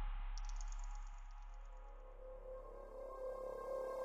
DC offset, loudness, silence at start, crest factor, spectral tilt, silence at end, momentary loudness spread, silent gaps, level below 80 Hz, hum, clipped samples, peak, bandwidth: under 0.1%; -51 LUFS; 0 s; 14 dB; -5 dB/octave; 0 s; 12 LU; none; -48 dBFS; none; under 0.1%; -34 dBFS; 7.8 kHz